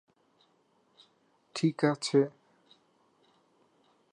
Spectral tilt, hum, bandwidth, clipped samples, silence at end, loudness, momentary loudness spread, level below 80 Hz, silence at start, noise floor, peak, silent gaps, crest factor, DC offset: -5.5 dB/octave; none; 11 kHz; under 0.1%; 1.85 s; -30 LUFS; 8 LU; -88 dBFS; 1.55 s; -70 dBFS; -14 dBFS; none; 22 dB; under 0.1%